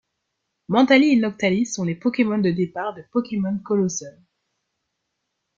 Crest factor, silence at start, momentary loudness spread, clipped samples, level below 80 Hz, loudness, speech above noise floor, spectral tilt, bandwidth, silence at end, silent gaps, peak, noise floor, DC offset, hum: 18 dB; 0.7 s; 11 LU; under 0.1%; -64 dBFS; -21 LUFS; 57 dB; -5.5 dB/octave; 7.6 kHz; 1.5 s; none; -4 dBFS; -78 dBFS; under 0.1%; none